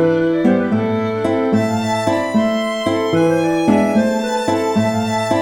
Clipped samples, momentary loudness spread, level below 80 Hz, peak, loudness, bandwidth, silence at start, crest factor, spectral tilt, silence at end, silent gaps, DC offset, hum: under 0.1%; 4 LU; -52 dBFS; -4 dBFS; -16 LUFS; 16 kHz; 0 s; 12 dB; -6 dB/octave; 0 s; none; under 0.1%; none